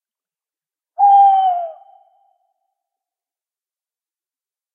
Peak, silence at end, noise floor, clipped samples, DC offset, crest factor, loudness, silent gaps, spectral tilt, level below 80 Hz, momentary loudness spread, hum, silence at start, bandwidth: -4 dBFS; 3.05 s; under -90 dBFS; under 0.1%; under 0.1%; 16 dB; -13 LUFS; none; -0.5 dB/octave; under -90 dBFS; 21 LU; none; 1 s; 3.4 kHz